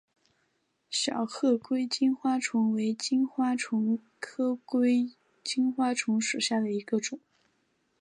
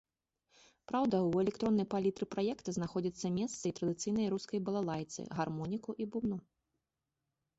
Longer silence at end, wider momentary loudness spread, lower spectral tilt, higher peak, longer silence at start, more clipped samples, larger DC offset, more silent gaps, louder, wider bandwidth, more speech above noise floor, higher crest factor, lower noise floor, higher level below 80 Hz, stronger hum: second, 0.85 s vs 1.2 s; about the same, 7 LU vs 7 LU; second, -3.5 dB/octave vs -7 dB/octave; first, -14 dBFS vs -20 dBFS; about the same, 0.9 s vs 0.9 s; neither; neither; neither; first, -29 LUFS vs -36 LUFS; first, 11 kHz vs 8 kHz; second, 47 dB vs 53 dB; about the same, 14 dB vs 16 dB; second, -75 dBFS vs -89 dBFS; second, -84 dBFS vs -68 dBFS; neither